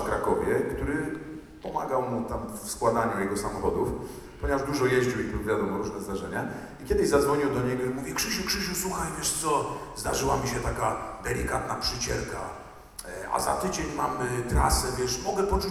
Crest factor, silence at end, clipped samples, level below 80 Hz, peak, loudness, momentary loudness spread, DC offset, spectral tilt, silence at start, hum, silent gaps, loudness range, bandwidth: 18 dB; 0 s; under 0.1%; -40 dBFS; -10 dBFS; -28 LUFS; 10 LU; under 0.1%; -4 dB/octave; 0 s; none; none; 3 LU; 17.5 kHz